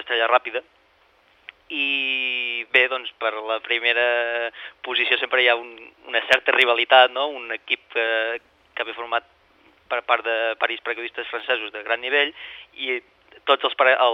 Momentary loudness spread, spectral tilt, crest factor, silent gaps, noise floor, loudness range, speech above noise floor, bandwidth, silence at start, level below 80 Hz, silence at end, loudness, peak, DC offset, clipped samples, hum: 13 LU; -1.5 dB/octave; 22 dB; none; -59 dBFS; 6 LU; 37 dB; 10 kHz; 0 s; -72 dBFS; 0 s; -21 LUFS; -2 dBFS; under 0.1%; under 0.1%; none